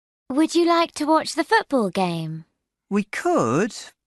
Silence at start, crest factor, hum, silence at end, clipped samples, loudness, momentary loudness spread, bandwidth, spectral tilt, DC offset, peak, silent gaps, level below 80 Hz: 0.3 s; 16 dB; none; 0.15 s; under 0.1%; -22 LUFS; 9 LU; 12 kHz; -5 dB/octave; under 0.1%; -6 dBFS; none; -66 dBFS